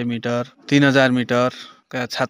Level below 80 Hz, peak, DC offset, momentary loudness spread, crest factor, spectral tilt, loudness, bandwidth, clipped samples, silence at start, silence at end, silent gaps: -64 dBFS; -2 dBFS; under 0.1%; 14 LU; 18 dB; -5.5 dB/octave; -19 LUFS; 16 kHz; under 0.1%; 0 s; 0 s; none